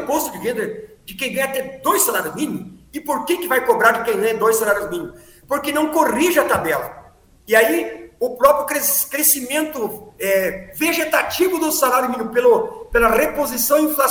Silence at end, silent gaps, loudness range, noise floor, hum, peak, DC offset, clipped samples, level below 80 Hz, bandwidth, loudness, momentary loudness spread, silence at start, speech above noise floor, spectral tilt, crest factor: 0 s; none; 2 LU; -46 dBFS; none; 0 dBFS; under 0.1%; under 0.1%; -46 dBFS; over 20 kHz; -18 LUFS; 11 LU; 0 s; 28 dB; -2.5 dB/octave; 18 dB